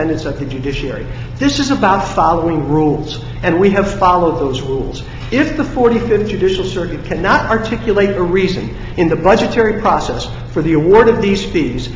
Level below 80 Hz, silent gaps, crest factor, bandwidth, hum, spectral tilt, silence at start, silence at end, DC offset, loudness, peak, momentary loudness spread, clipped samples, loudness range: -30 dBFS; none; 14 dB; 7.8 kHz; none; -6 dB/octave; 0 s; 0 s; under 0.1%; -14 LUFS; 0 dBFS; 10 LU; under 0.1%; 2 LU